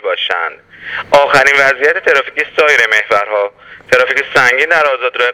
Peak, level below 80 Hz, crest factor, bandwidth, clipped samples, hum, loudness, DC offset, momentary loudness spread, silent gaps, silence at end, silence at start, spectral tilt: 0 dBFS; -52 dBFS; 12 dB; 18 kHz; 0.4%; none; -10 LUFS; under 0.1%; 11 LU; none; 0 s; 0.05 s; -2 dB/octave